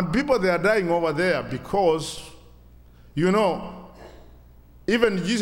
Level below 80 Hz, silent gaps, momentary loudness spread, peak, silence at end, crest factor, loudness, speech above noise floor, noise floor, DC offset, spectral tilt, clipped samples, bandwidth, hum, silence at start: -48 dBFS; none; 14 LU; -2 dBFS; 0 s; 22 dB; -23 LUFS; 27 dB; -49 dBFS; under 0.1%; -5.5 dB/octave; under 0.1%; 16.5 kHz; 60 Hz at -50 dBFS; 0 s